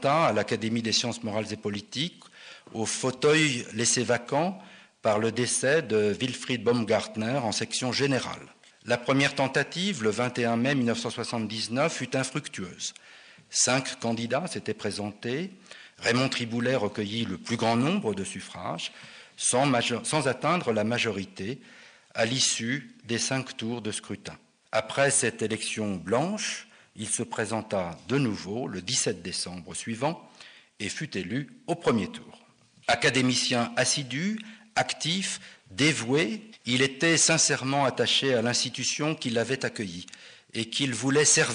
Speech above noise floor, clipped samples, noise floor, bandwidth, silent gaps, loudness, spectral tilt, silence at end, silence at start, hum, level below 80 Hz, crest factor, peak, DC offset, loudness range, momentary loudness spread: 24 dB; under 0.1%; -52 dBFS; 10 kHz; none; -27 LUFS; -3 dB/octave; 0 s; 0 s; none; -68 dBFS; 18 dB; -10 dBFS; under 0.1%; 5 LU; 13 LU